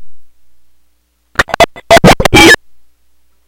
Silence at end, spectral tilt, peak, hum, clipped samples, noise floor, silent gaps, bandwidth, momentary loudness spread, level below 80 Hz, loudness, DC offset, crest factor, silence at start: 0.9 s; -4 dB/octave; 0 dBFS; none; 4%; -54 dBFS; none; over 20 kHz; 11 LU; -26 dBFS; -6 LUFS; under 0.1%; 10 dB; 0 s